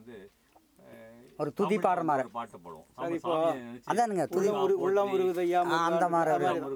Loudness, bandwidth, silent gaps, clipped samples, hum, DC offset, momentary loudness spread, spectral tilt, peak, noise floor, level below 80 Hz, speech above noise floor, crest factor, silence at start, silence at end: -29 LUFS; 19.5 kHz; none; under 0.1%; none; under 0.1%; 12 LU; -6 dB/octave; -10 dBFS; -64 dBFS; -74 dBFS; 36 dB; 18 dB; 0 s; 0 s